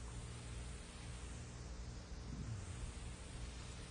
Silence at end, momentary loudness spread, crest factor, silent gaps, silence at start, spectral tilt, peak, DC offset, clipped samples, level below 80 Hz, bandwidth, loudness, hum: 0 s; 4 LU; 14 dB; none; 0 s; -4.5 dB/octave; -36 dBFS; under 0.1%; under 0.1%; -52 dBFS; 10.5 kHz; -51 LUFS; 60 Hz at -55 dBFS